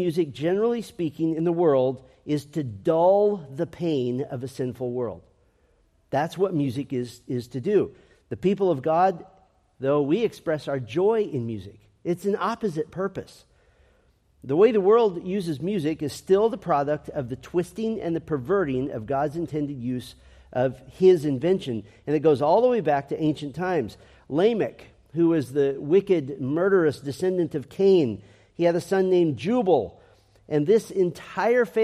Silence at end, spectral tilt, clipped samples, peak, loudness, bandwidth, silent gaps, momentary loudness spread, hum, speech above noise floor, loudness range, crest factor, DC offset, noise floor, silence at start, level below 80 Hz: 0 s; -7.5 dB/octave; under 0.1%; -6 dBFS; -24 LUFS; 13 kHz; none; 12 LU; none; 40 dB; 5 LU; 18 dB; under 0.1%; -63 dBFS; 0 s; -60 dBFS